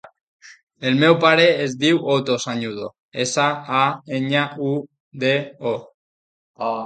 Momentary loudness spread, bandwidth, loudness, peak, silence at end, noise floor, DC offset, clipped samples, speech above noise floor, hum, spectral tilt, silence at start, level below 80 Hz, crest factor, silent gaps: 14 LU; 9.2 kHz; -19 LUFS; 0 dBFS; 0 s; under -90 dBFS; under 0.1%; under 0.1%; over 71 dB; none; -4.5 dB/octave; 0.45 s; -66 dBFS; 20 dB; 0.63-0.67 s, 2.99-3.12 s, 5.00-5.11 s, 5.94-6.54 s